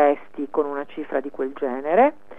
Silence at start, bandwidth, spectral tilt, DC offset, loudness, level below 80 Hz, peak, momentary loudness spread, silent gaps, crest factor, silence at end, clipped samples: 0 s; 3.8 kHz; -7.5 dB/octave; 1%; -24 LUFS; -66 dBFS; -4 dBFS; 10 LU; none; 18 dB; 0.25 s; under 0.1%